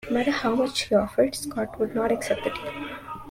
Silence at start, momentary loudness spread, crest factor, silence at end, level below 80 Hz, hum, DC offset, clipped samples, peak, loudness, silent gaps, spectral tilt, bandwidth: 0 s; 11 LU; 18 dB; 0 s; -52 dBFS; none; under 0.1%; under 0.1%; -8 dBFS; -26 LUFS; none; -4 dB/octave; 16.5 kHz